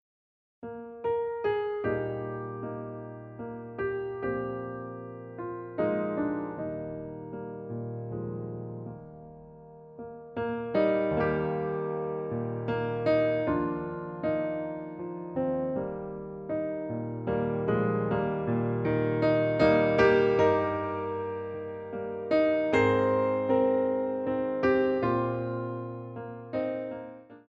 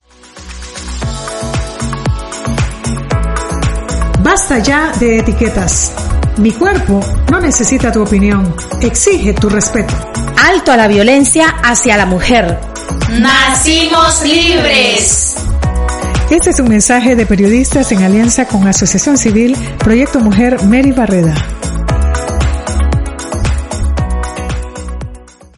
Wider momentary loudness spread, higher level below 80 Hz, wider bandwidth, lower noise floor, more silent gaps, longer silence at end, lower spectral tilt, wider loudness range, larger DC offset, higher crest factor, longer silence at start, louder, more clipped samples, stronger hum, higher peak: first, 16 LU vs 11 LU; second, -58 dBFS vs -18 dBFS; second, 7.4 kHz vs 12 kHz; first, under -90 dBFS vs -33 dBFS; neither; second, 0.05 s vs 0.35 s; first, -8.5 dB/octave vs -4 dB/octave; first, 10 LU vs 7 LU; neither; first, 20 dB vs 10 dB; first, 0.6 s vs 0.35 s; second, -30 LUFS vs -10 LUFS; neither; neither; second, -10 dBFS vs 0 dBFS